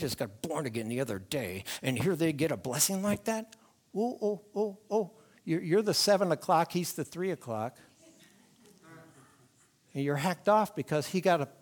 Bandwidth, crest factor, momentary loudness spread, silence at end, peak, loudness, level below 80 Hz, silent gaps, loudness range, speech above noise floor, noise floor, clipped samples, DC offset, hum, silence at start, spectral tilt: 19.5 kHz; 20 dB; 10 LU; 0.1 s; -12 dBFS; -31 LUFS; -70 dBFS; none; 8 LU; 35 dB; -65 dBFS; under 0.1%; under 0.1%; none; 0 s; -4.5 dB/octave